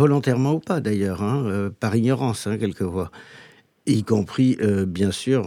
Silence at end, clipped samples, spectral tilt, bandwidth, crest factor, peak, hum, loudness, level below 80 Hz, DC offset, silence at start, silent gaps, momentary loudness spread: 0 s; under 0.1%; -7 dB/octave; 15 kHz; 16 dB; -4 dBFS; none; -22 LUFS; -54 dBFS; under 0.1%; 0 s; none; 6 LU